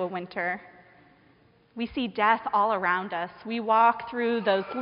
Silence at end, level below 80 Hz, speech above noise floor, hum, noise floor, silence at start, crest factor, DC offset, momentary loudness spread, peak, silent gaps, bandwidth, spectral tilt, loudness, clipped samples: 0 s; -66 dBFS; 34 dB; none; -60 dBFS; 0 s; 18 dB; under 0.1%; 12 LU; -8 dBFS; none; 5.4 kHz; -2.5 dB/octave; -26 LUFS; under 0.1%